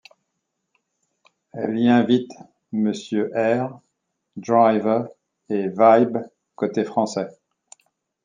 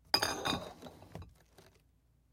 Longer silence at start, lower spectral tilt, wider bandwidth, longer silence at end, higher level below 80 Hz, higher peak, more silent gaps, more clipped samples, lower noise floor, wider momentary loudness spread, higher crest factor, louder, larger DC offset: first, 1.55 s vs 0.15 s; first, -6.5 dB/octave vs -2.5 dB/octave; second, 9.4 kHz vs 16.5 kHz; about the same, 0.95 s vs 1.05 s; second, -70 dBFS vs -62 dBFS; first, -2 dBFS vs -10 dBFS; neither; neither; first, -77 dBFS vs -70 dBFS; second, 19 LU vs 22 LU; second, 20 dB vs 30 dB; first, -21 LUFS vs -34 LUFS; neither